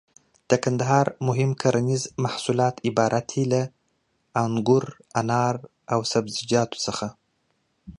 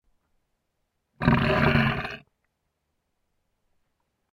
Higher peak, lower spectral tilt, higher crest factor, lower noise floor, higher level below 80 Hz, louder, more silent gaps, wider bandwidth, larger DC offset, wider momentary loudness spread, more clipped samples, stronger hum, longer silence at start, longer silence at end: about the same, -4 dBFS vs -4 dBFS; second, -5.5 dB/octave vs -7.5 dB/octave; about the same, 20 dB vs 24 dB; second, -71 dBFS vs -78 dBFS; second, -60 dBFS vs -44 dBFS; about the same, -24 LUFS vs -23 LUFS; neither; about the same, 11 kHz vs 12 kHz; neither; second, 7 LU vs 14 LU; neither; neither; second, 0.5 s vs 1.2 s; second, 0.05 s vs 2.2 s